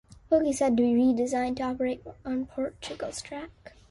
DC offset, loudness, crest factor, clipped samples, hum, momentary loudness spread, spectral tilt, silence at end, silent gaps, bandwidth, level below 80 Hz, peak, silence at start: under 0.1%; -28 LUFS; 16 dB; under 0.1%; none; 14 LU; -5 dB/octave; 0.2 s; none; 11.5 kHz; -56 dBFS; -12 dBFS; 0.3 s